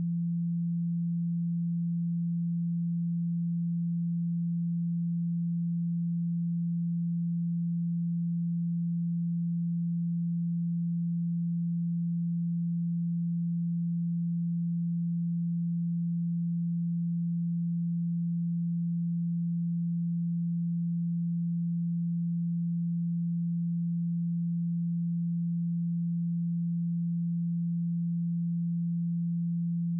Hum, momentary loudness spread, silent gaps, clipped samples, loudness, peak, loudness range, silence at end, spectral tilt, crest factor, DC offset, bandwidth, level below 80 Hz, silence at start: none; 0 LU; none; under 0.1%; -31 LUFS; -28 dBFS; 0 LU; 0 s; -29 dB/octave; 4 dB; under 0.1%; 0.2 kHz; under -90 dBFS; 0 s